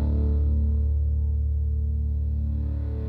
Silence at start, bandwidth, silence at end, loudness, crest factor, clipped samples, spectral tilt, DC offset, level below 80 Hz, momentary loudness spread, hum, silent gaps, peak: 0 s; 1.4 kHz; 0 s; -26 LUFS; 8 dB; under 0.1%; -12 dB/octave; under 0.1%; -24 dBFS; 4 LU; none; none; -16 dBFS